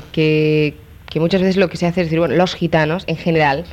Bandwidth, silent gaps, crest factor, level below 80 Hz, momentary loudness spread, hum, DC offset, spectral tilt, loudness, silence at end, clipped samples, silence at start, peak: 13.5 kHz; none; 14 dB; -42 dBFS; 5 LU; none; under 0.1%; -7 dB/octave; -16 LUFS; 0 s; under 0.1%; 0 s; -4 dBFS